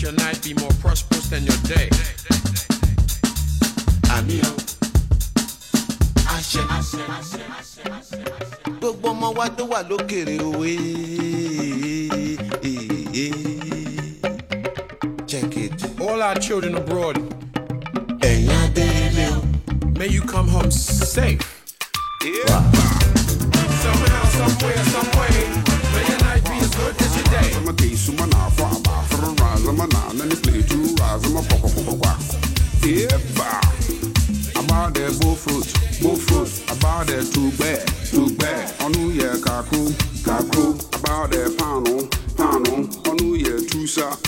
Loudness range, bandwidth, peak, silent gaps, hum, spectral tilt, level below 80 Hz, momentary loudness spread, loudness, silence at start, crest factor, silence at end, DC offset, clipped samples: 7 LU; 16.5 kHz; -4 dBFS; none; none; -5 dB/octave; -24 dBFS; 9 LU; -20 LUFS; 0 s; 16 dB; 0 s; under 0.1%; under 0.1%